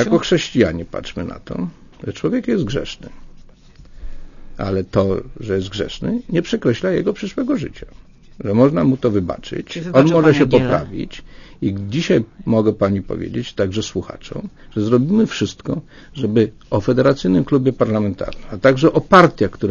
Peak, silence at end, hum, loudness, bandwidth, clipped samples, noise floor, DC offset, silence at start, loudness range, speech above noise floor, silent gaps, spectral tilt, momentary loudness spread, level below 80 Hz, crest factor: 0 dBFS; 0 s; none; -18 LUFS; 7.4 kHz; under 0.1%; -42 dBFS; under 0.1%; 0 s; 8 LU; 25 dB; none; -7 dB/octave; 15 LU; -40 dBFS; 18 dB